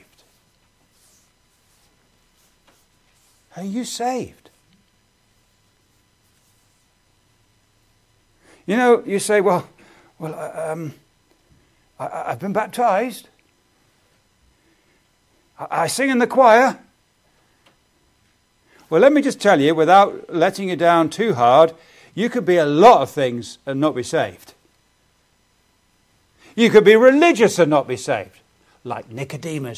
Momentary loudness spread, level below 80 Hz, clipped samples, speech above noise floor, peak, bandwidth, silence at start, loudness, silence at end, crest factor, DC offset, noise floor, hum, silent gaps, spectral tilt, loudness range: 20 LU; -64 dBFS; under 0.1%; 45 dB; 0 dBFS; 15.5 kHz; 3.55 s; -17 LUFS; 0 s; 20 dB; under 0.1%; -61 dBFS; none; none; -5 dB/octave; 15 LU